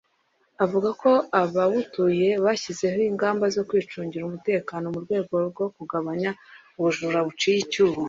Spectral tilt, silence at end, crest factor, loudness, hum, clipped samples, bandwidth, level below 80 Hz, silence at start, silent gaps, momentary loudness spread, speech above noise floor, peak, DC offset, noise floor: -5.5 dB/octave; 0 s; 18 dB; -24 LUFS; none; under 0.1%; 7.8 kHz; -66 dBFS; 0.6 s; none; 9 LU; 44 dB; -6 dBFS; under 0.1%; -68 dBFS